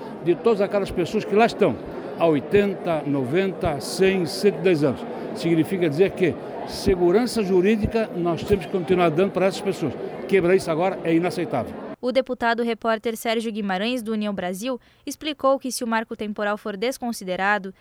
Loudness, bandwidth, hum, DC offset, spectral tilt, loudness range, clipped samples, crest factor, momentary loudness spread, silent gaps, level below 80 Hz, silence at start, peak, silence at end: -23 LUFS; over 20 kHz; none; under 0.1%; -5.5 dB/octave; 4 LU; under 0.1%; 16 dB; 9 LU; none; -48 dBFS; 0 s; -6 dBFS; 0.1 s